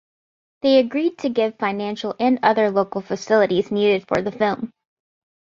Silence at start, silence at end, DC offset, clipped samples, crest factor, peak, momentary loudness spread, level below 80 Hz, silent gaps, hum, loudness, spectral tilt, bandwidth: 0.65 s; 0.9 s; under 0.1%; under 0.1%; 18 dB; -2 dBFS; 8 LU; -60 dBFS; none; none; -20 LUFS; -6 dB/octave; 7.4 kHz